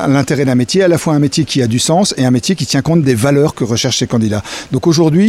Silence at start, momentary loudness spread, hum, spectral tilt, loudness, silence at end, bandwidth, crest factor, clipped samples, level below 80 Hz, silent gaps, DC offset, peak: 0 s; 4 LU; none; -5 dB/octave; -13 LUFS; 0 s; 15.5 kHz; 12 dB; under 0.1%; -44 dBFS; none; under 0.1%; 0 dBFS